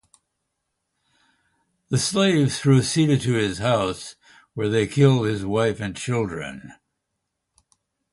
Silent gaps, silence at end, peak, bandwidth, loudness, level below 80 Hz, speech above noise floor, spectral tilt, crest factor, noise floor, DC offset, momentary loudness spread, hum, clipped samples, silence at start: none; 1.4 s; -4 dBFS; 11.5 kHz; -21 LUFS; -52 dBFS; 58 dB; -5.5 dB/octave; 18 dB; -79 dBFS; under 0.1%; 15 LU; none; under 0.1%; 1.9 s